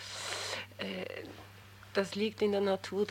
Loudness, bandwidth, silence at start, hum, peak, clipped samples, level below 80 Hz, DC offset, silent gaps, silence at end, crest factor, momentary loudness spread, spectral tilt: -35 LUFS; 17 kHz; 0 s; none; -16 dBFS; under 0.1%; -70 dBFS; under 0.1%; none; 0 s; 20 dB; 18 LU; -4 dB/octave